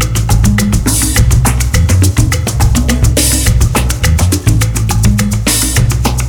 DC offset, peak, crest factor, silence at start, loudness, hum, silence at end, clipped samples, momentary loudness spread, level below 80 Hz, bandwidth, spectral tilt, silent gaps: under 0.1%; 0 dBFS; 10 dB; 0 s; -11 LUFS; none; 0 s; under 0.1%; 3 LU; -14 dBFS; 19.5 kHz; -4.5 dB/octave; none